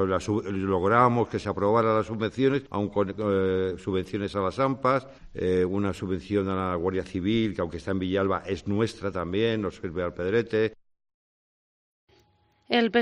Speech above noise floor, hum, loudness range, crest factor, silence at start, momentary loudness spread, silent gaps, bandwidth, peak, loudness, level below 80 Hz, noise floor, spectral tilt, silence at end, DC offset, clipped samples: 39 dB; none; 5 LU; 20 dB; 0 s; 7 LU; 11.14-12.08 s; 10.5 kHz; -6 dBFS; -27 LUFS; -54 dBFS; -65 dBFS; -7 dB/octave; 0 s; under 0.1%; under 0.1%